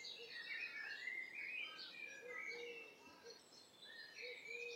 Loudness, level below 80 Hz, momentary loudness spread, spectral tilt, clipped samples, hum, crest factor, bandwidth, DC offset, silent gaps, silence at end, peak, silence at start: -50 LUFS; under -90 dBFS; 13 LU; -0.5 dB/octave; under 0.1%; none; 16 dB; 16 kHz; under 0.1%; none; 0 s; -36 dBFS; 0 s